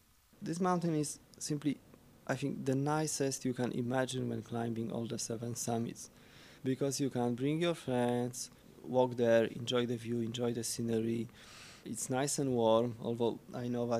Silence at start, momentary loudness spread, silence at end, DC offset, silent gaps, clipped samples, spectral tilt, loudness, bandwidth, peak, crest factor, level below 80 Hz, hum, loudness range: 0.4 s; 12 LU; 0 s; under 0.1%; none; under 0.1%; -5 dB/octave; -35 LUFS; 15.5 kHz; -16 dBFS; 20 dB; -70 dBFS; none; 4 LU